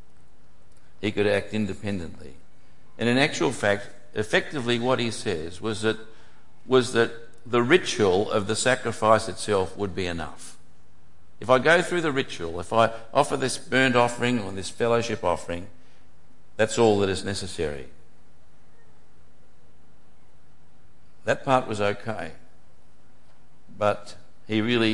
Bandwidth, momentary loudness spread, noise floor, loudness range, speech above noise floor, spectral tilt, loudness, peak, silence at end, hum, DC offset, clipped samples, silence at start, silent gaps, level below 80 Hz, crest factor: 11.5 kHz; 14 LU; -59 dBFS; 7 LU; 35 dB; -4.5 dB/octave; -25 LUFS; -4 dBFS; 0 s; none; 2%; under 0.1%; 1 s; none; -58 dBFS; 22 dB